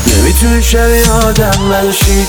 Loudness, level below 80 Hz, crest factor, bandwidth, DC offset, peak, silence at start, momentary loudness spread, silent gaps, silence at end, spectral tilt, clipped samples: -9 LUFS; -12 dBFS; 8 dB; over 20 kHz; under 0.1%; 0 dBFS; 0 s; 2 LU; none; 0 s; -4 dB/octave; 0.9%